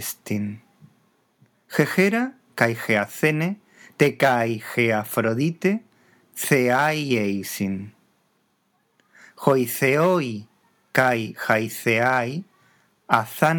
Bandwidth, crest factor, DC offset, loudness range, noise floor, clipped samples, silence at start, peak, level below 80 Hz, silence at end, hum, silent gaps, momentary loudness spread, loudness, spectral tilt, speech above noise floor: over 20 kHz; 24 dB; under 0.1%; 3 LU; -68 dBFS; under 0.1%; 0 s; 0 dBFS; -76 dBFS; 0 s; none; none; 11 LU; -22 LUFS; -5.5 dB/octave; 46 dB